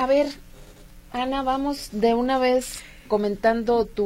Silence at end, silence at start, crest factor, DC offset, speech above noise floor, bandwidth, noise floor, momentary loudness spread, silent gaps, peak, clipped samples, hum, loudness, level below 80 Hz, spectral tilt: 0 s; 0 s; 16 dB; under 0.1%; 23 dB; 16.5 kHz; -45 dBFS; 12 LU; none; -6 dBFS; under 0.1%; none; -23 LUFS; -46 dBFS; -4.5 dB/octave